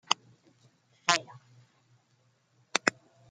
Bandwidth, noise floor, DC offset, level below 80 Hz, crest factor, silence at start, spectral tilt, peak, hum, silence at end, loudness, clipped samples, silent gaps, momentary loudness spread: 11 kHz; -70 dBFS; under 0.1%; -82 dBFS; 34 dB; 0.1 s; -1 dB/octave; -2 dBFS; none; 0.4 s; -30 LUFS; under 0.1%; none; 6 LU